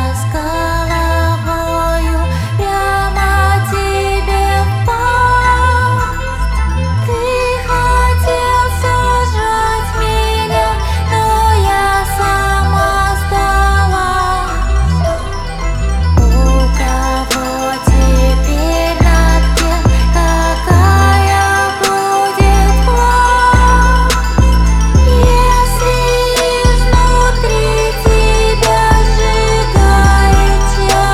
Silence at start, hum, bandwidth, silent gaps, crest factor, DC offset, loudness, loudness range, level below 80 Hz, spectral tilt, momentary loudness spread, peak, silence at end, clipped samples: 0 s; none; 15.5 kHz; none; 10 dB; under 0.1%; -12 LUFS; 4 LU; -14 dBFS; -5 dB/octave; 6 LU; 0 dBFS; 0 s; under 0.1%